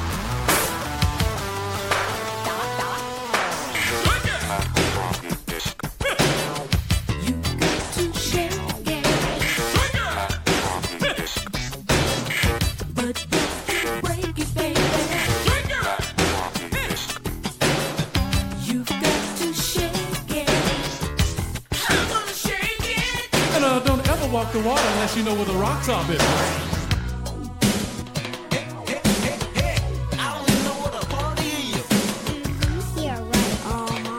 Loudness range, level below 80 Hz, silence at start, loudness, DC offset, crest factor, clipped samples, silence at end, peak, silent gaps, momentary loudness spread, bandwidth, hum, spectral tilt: 3 LU; -34 dBFS; 0 s; -23 LUFS; under 0.1%; 18 dB; under 0.1%; 0 s; -4 dBFS; none; 6 LU; 17 kHz; none; -4 dB/octave